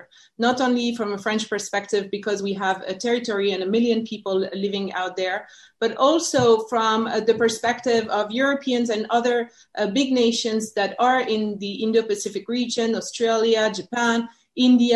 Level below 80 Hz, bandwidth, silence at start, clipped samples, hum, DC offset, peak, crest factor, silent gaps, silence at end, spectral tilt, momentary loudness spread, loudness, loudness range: -64 dBFS; 12 kHz; 0.4 s; under 0.1%; none; under 0.1%; -6 dBFS; 16 dB; none; 0 s; -4 dB/octave; 7 LU; -22 LUFS; 3 LU